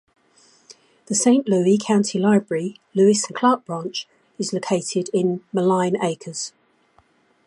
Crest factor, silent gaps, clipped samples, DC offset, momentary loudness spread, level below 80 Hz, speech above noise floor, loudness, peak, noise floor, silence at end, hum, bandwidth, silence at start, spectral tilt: 18 dB; none; under 0.1%; under 0.1%; 12 LU; -70 dBFS; 40 dB; -21 LUFS; -2 dBFS; -60 dBFS; 1 s; none; 11.5 kHz; 0.7 s; -5 dB/octave